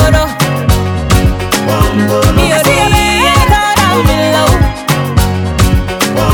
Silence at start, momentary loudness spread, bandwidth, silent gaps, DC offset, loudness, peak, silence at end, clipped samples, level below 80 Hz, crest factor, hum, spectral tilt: 0 s; 4 LU; 19.5 kHz; none; 0.2%; -10 LUFS; 0 dBFS; 0 s; 0.5%; -18 dBFS; 10 dB; none; -5 dB/octave